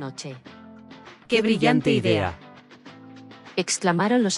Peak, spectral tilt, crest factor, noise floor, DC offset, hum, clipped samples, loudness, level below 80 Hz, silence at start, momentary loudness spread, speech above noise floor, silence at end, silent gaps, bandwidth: -6 dBFS; -4.5 dB/octave; 20 dB; -46 dBFS; under 0.1%; none; under 0.1%; -22 LUFS; -58 dBFS; 0 s; 25 LU; 24 dB; 0 s; none; 12 kHz